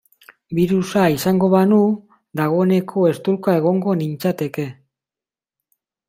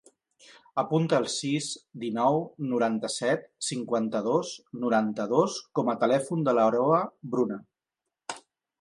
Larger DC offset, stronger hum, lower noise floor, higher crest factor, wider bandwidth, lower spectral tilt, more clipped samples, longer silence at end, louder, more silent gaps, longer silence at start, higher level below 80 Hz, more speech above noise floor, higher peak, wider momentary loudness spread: neither; neither; about the same, under -90 dBFS vs -87 dBFS; about the same, 16 dB vs 20 dB; first, 16 kHz vs 11.5 kHz; first, -7 dB/octave vs -5 dB/octave; neither; first, 1.35 s vs 0.4 s; first, -18 LUFS vs -27 LUFS; neither; second, 0.5 s vs 0.75 s; first, -58 dBFS vs -78 dBFS; first, over 73 dB vs 61 dB; first, -2 dBFS vs -8 dBFS; about the same, 11 LU vs 11 LU